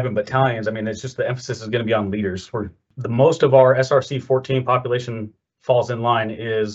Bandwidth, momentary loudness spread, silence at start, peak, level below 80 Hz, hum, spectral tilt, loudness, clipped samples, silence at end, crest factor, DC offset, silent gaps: 8 kHz; 15 LU; 0 s; -2 dBFS; -60 dBFS; none; -6.5 dB/octave; -20 LUFS; under 0.1%; 0 s; 18 dB; under 0.1%; none